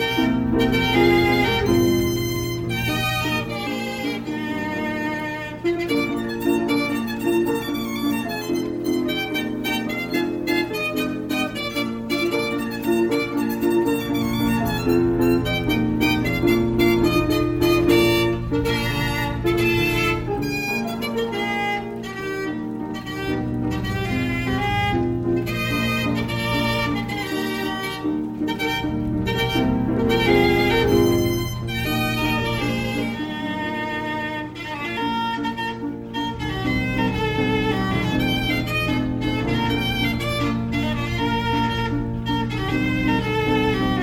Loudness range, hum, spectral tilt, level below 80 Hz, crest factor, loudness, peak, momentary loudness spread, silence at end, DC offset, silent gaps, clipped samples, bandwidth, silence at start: 5 LU; none; -5.5 dB/octave; -38 dBFS; 16 dB; -22 LUFS; -6 dBFS; 8 LU; 0 s; under 0.1%; none; under 0.1%; 17 kHz; 0 s